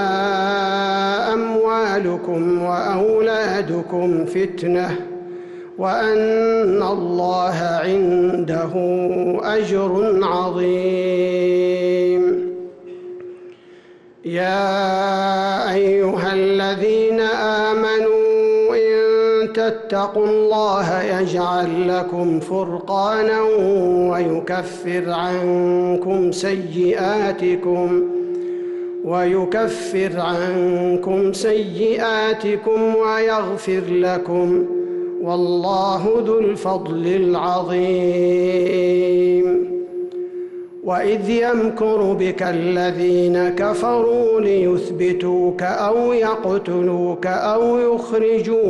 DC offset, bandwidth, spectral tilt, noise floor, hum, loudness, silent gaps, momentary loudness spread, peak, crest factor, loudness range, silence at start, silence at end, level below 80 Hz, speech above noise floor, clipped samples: under 0.1%; 11.5 kHz; -6.5 dB/octave; -45 dBFS; none; -18 LUFS; none; 6 LU; -10 dBFS; 8 dB; 3 LU; 0 s; 0 s; -56 dBFS; 27 dB; under 0.1%